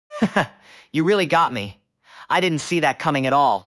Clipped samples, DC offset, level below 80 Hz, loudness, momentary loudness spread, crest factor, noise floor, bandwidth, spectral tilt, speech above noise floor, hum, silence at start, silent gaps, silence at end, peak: under 0.1%; under 0.1%; -60 dBFS; -20 LUFS; 10 LU; 16 dB; -47 dBFS; 12 kHz; -5 dB/octave; 27 dB; none; 0.1 s; none; 0.15 s; -6 dBFS